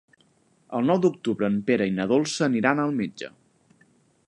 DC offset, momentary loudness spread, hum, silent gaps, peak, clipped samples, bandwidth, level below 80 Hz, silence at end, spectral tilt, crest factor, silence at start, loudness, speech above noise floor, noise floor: under 0.1%; 11 LU; none; none; -6 dBFS; under 0.1%; 11.5 kHz; -66 dBFS; 1 s; -5.5 dB/octave; 18 dB; 0.7 s; -24 LUFS; 40 dB; -63 dBFS